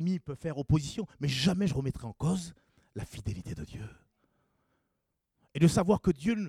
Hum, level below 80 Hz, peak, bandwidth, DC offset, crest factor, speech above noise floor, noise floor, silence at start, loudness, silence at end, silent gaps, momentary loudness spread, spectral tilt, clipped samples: none; -52 dBFS; -12 dBFS; 14 kHz; under 0.1%; 20 dB; 52 dB; -82 dBFS; 0 s; -30 LUFS; 0 s; none; 17 LU; -6.5 dB/octave; under 0.1%